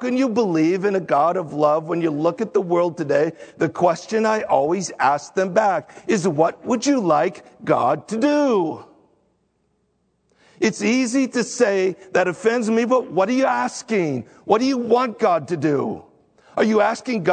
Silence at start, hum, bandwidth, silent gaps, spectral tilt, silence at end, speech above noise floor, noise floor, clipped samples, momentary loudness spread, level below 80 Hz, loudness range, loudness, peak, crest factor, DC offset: 0 s; none; 9.4 kHz; none; -5.5 dB/octave; 0 s; 48 dB; -67 dBFS; under 0.1%; 5 LU; -68 dBFS; 3 LU; -20 LUFS; -2 dBFS; 18 dB; under 0.1%